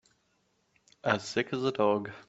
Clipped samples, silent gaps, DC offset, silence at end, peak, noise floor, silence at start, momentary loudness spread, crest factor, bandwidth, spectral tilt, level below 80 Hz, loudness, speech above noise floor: under 0.1%; none; under 0.1%; 0.05 s; -12 dBFS; -73 dBFS; 1.05 s; 4 LU; 22 dB; 8.2 kHz; -5 dB/octave; -72 dBFS; -30 LUFS; 44 dB